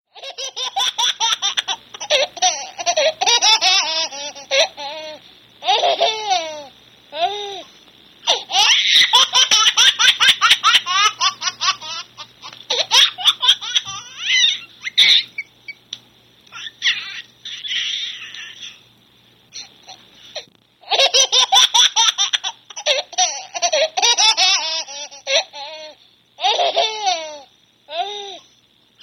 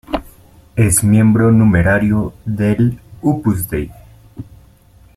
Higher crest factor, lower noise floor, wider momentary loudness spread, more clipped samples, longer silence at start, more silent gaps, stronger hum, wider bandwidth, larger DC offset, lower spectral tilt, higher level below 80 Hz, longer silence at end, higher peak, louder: about the same, 18 dB vs 14 dB; first, -56 dBFS vs -46 dBFS; first, 22 LU vs 15 LU; neither; about the same, 0.15 s vs 0.1 s; neither; neither; first, 17 kHz vs 15 kHz; neither; second, 2.5 dB/octave vs -6.5 dB/octave; second, -66 dBFS vs -36 dBFS; about the same, 0.65 s vs 0.75 s; about the same, 0 dBFS vs -2 dBFS; about the same, -15 LUFS vs -14 LUFS